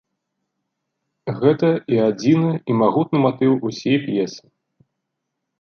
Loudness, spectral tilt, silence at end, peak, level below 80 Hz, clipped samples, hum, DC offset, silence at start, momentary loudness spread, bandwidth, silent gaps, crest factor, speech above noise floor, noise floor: -19 LUFS; -7.5 dB/octave; 1.2 s; -2 dBFS; -64 dBFS; under 0.1%; none; under 0.1%; 1.25 s; 7 LU; 6.8 kHz; none; 18 dB; 61 dB; -78 dBFS